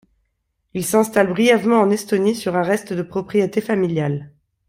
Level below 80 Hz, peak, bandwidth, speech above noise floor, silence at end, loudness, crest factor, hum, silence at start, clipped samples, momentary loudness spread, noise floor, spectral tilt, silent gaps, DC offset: -58 dBFS; -2 dBFS; 16 kHz; 53 dB; 0.4 s; -19 LUFS; 18 dB; none; 0.75 s; under 0.1%; 10 LU; -71 dBFS; -5.5 dB/octave; none; under 0.1%